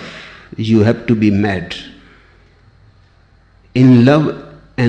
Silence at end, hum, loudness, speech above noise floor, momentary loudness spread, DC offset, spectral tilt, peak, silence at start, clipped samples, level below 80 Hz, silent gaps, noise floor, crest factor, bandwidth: 0 s; none; -13 LUFS; 38 dB; 23 LU; under 0.1%; -8 dB/octave; -2 dBFS; 0 s; under 0.1%; -46 dBFS; none; -49 dBFS; 14 dB; 8.4 kHz